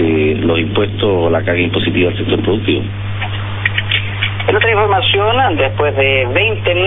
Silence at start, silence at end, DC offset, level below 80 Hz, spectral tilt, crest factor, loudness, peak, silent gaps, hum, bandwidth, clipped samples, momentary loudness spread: 0 s; 0 s; under 0.1%; -36 dBFS; -9.5 dB/octave; 14 dB; -14 LUFS; 0 dBFS; none; 50 Hz at -20 dBFS; 4 kHz; under 0.1%; 6 LU